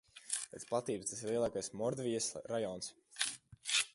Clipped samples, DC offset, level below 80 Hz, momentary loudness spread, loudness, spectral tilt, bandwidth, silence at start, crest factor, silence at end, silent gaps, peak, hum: under 0.1%; under 0.1%; -72 dBFS; 5 LU; -39 LUFS; -2.5 dB/octave; 12 kHz; 0.15 s; 26 dB; 0.05 s; none; -12 dBFS; none